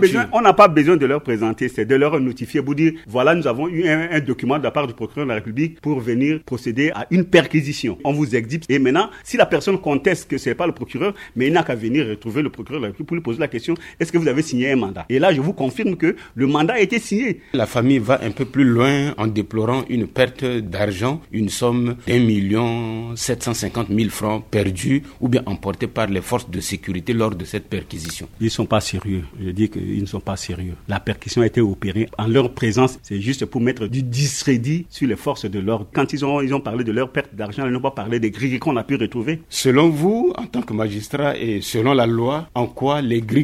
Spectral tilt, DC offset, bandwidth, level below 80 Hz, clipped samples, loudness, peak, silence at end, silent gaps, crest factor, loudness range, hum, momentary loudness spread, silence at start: -6 dB/octave; under 0.1%; 15.5 kHz; -46 dBFS; under 0.1%; -20 LUFS; 0 dBFS; 0 s; none; 20 dB; 4 LU; none; 8 LU; 0 s